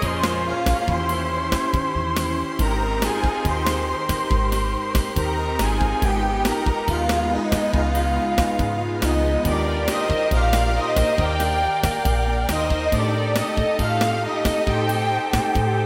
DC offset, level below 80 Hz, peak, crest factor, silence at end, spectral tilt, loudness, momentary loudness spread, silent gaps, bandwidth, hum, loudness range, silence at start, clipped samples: under 0.1%; -26 dBFS; -6 dBFS; 14 dB; 0 s; -5.5 dB/octave; -22 LUFS; 3 LU; none; 17 kHz; none; 2 LU; 0 s; under 0.1%